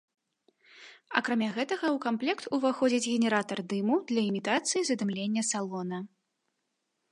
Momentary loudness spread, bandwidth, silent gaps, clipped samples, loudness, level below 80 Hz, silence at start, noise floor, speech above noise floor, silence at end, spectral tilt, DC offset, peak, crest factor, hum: 6 LU; 11.5 kHz; none; under 0.1%; -29 LUFS; -82 dBFS; 0.75 s; -81 dBFS; 52 dB; 1.05 s; -4 dB/octave; under 0.1%; -8 dBFS; 24 dB; none